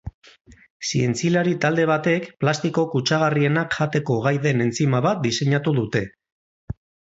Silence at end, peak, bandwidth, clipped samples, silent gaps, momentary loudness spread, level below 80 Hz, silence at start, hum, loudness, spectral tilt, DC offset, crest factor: 0.4 s; -6 dBFS; 8 kHz; under 0.1%; 0.14-0.22 s, 0.41-0.45 s, 0.70-0.80 s, 6.32-6.68 s; 11 LU; -52 dBFS; 0.05 s; none; -21 LUFS; -5.5 dB/octave; under 0.1%; 16 dB